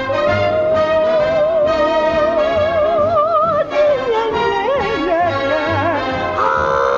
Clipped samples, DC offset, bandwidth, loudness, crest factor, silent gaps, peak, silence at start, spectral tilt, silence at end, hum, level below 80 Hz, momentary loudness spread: under 0.1%; under 0.1%; 7.2 kHz; -15 LUFS; 12 dB; none; -4 dBFS; 0 s; -6 dB/octave; 0 s; none; -40 dBFS; 3 LU